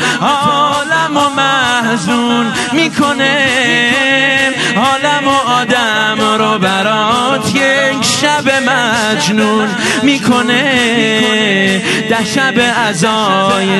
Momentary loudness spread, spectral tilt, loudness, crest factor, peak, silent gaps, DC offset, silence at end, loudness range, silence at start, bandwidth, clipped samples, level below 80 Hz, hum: 3 LU; -3.5 dB/octave; -11 LUFS; 12 dB; 0 dBFS; none; under 0.1%; 0 s; 1 LU; 0 s; 12.5 kHz; under 0.1%; -50 dBFS; none